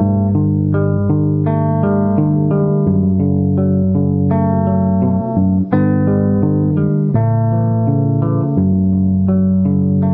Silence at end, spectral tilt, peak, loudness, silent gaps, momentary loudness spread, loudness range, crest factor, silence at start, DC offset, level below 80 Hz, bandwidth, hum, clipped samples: 0 s; -15 dB/octave; 0 dBFS; -15 LUFS; none; 1 LU; 0 LU; 12 dB; 0 s; under 0.1%; -42 dBFS; 2.6 kHz; none; under 0.1%